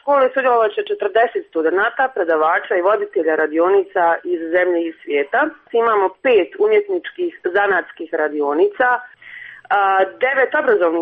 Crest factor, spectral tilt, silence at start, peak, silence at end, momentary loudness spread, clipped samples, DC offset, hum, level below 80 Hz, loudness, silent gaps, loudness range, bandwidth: 12 dB; -6.5 dB/octave; 0.05 s; -4 dBFS; 0 s; 6 LU; under 0.1%; under 0.1%; none; -66 dBFS; -17 LUFS; none; 2 LU; 4.7 kHz